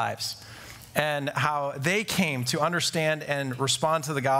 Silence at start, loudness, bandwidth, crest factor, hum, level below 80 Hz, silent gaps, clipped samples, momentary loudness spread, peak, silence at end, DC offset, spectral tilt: 0 s; -26 LUFS; 16 kHz; 22 dB; none; -62 dBFS; none; under 0.1%; 8 LU; -4 dBFS; 0 s; under 0.1%; -3.5 dB/octave